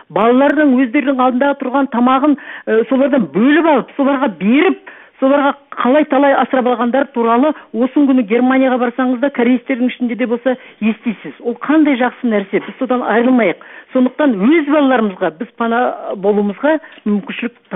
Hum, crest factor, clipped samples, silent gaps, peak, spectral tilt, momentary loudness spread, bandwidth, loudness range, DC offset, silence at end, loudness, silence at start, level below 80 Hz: none; 14 dB; under 0.1%; none; 0 dBFS; -9.5 dB/octave; 8 LU; 3.9 kHz; 3 LU; under 0.1%; 0 s; -14 LUFS; 0.1 s; -64 dBFS